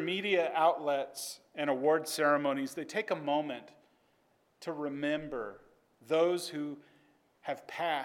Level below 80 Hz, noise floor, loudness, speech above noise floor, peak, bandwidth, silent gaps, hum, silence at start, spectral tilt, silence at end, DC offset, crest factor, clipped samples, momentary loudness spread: -76 dBFS; -71 dBFS; -33 LUFS; 39 dB; -14 dBFS; 18 kHz; none; none; 0 s; -4 dB/octave; 0 s; under 0.1%; 20 dB; under 0.1%; 13 LU